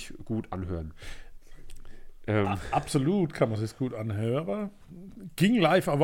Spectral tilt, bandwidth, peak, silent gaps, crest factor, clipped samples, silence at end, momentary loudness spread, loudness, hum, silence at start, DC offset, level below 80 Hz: -6.5 dB/octave; 17 kHz; -10 dBFS; none; 20 dB; under 0.1%; 0 s; 20 LU; -28 LUFS; none; 0 s; under 0.1%; -48 dBFS